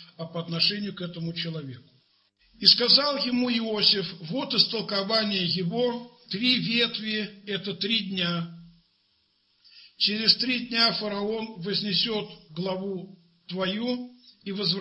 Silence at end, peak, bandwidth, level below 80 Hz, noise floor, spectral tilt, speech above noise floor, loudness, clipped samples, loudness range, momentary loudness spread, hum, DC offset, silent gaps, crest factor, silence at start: 0 s; -2 dBFS; 8.8 kHz; -70 dBFS; -69 dBFS; -6 dB/octave; 43 dB; -24 LUFS; under 0.1%; 7 LU; 15 LU; none; under 0.1%; none; 26 dB; 0 s